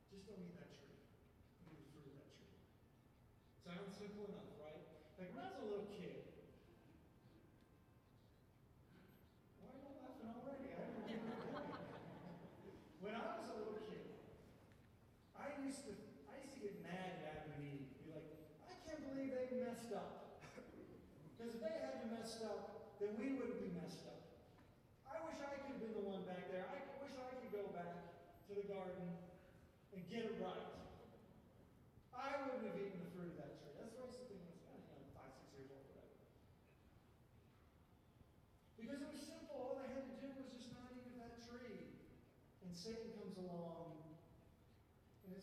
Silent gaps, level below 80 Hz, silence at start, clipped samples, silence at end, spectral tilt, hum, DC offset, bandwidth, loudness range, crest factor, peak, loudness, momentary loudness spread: none; -76 dBFS; 0 s; under 0.1%; 0 s; -6 dB/octave; none; under 0.1%; 14.5 kHz; 12 LU; 20 dB; -34 dBFS; -52 LUFS; 19 LU